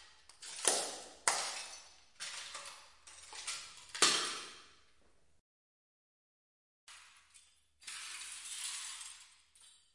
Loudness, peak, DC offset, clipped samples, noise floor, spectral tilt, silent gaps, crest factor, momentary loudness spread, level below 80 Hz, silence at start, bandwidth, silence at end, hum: -37 LUFS; -12 dBFS; under 0.1%; under 0.1%; -73 dBFS; 1 dB/octave; 5.40-6.87 s; 32 dB; 25 LU; -80 dBFS; 0 s; 11.5 kHz; 0.2 s; none